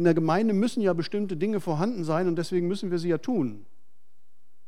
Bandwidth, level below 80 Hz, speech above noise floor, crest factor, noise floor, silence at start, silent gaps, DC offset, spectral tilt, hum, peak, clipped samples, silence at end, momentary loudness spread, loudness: 13 kHz; -76 dBFS; 49 dB; 18 dB; -75 dBFS; 0 s; none; 1%; -7 dB/octave; none; -10 dBFS; under 0.1%; 1.05 s; 5 LU; -27 LUFS